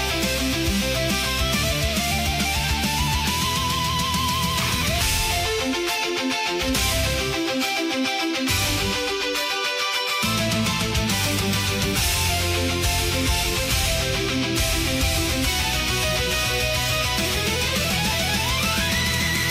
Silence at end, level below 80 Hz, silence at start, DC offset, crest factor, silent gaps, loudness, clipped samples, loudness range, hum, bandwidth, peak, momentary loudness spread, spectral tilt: 0 s; -32 dBFS; 0 s; under 0.1%; 14 dB; none; -21 LUFS; under 0.1%; 1 LU; none; 16 kHz; -10 dBFS; 2 LU; -3 dB/octave